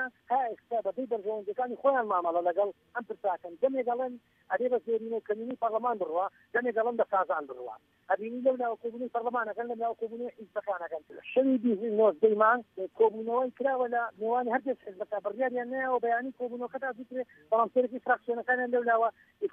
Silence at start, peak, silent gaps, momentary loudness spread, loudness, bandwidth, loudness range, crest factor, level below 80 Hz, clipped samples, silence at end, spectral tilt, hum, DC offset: 0 s; -12 dBFS; none; 11 LU; -30 LUFS; 3.7 kHz; 5 LU; 18 dB; -82 dBFS; under 0.1%; 0.05 s; -8 dB/octave; none; under 0.1%